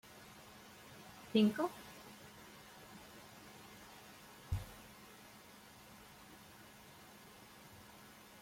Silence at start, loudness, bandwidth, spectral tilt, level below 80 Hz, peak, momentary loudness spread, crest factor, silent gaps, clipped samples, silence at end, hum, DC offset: 0.05 s; -39 LUFS; 16.5 kHz; -5.5 dB/octave; -62 dBFS; -20 dBFS; 20 LU; 24 dB; none; under 0.1%; 0 s; none; under 0.1%